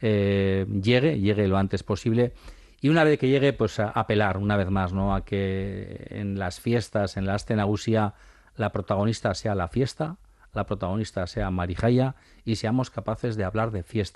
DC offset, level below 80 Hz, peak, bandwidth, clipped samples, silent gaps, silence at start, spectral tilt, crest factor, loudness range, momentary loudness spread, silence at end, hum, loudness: under 0.1%; -46 dBFS; -8 dBFS; 12 kHz; under 0.1%; none; 0 s; -7 dB/octave; 16 dB; 4 LU; 9 LU; 0.05 s; none; -26 LUFS